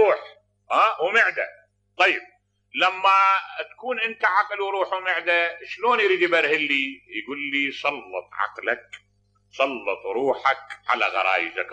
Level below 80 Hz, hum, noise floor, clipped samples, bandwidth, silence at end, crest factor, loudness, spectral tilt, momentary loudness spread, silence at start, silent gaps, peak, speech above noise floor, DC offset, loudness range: -74 dBFS; 50 Hz at -70 dBFS; -47 dBFS; under 0.1%; 9 kHz; 0 s; 18 dB; -22 LUFS; -3 dB/octave; 10 LU; 0 s; none; -6 dBFS; 24 dB; under 0.1%; 5 LU